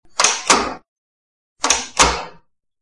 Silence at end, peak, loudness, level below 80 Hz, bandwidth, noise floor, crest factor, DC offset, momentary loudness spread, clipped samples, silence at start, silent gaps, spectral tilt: 0.5 s; 0 dBFS; -16 LUFS; -40 dBFS; 12 kHz; -51 dBFS; 20 dB; 0.5%; 16 LU; under 0.1%; 0.2 s; 0.88-1.56 s; -0.5 dB/octave